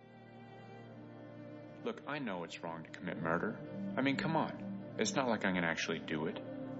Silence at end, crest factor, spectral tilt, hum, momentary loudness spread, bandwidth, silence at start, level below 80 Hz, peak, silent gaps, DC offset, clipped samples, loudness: 0 s; 22 dB; -4 dB/octave; none; 19 LU; 7.6 kHz; 0 s; -72 dBFS; -18 dBFS; none; under 0.1%; under 0.1%; -38 LUFS